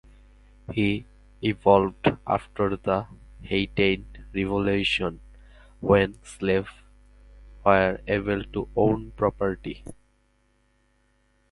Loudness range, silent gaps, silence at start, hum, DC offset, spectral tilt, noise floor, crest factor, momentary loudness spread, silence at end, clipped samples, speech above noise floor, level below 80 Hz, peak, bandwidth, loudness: 2 LU; none; 0.7 s; 50 Hz at -45 dBFS; under 0.1%; -6.5 dB/octave; -66 dBFS; 24 dB; 12 LU; 1.6 s; under 0.1%; 42 dB; -46 dBFS; -4 dBFS; 11.5 kHz; -25 LUFS